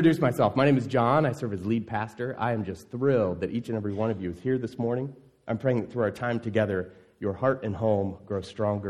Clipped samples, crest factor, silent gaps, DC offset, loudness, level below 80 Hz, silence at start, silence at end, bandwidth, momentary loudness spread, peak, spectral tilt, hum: under 0.1%; 18 dB; none; under 0.1%; -28 LUFS; -60 dBFS; 0 s; 0 s; 14.5 kHz; 11 LU; -8 dBFS; -8 dB/octave; none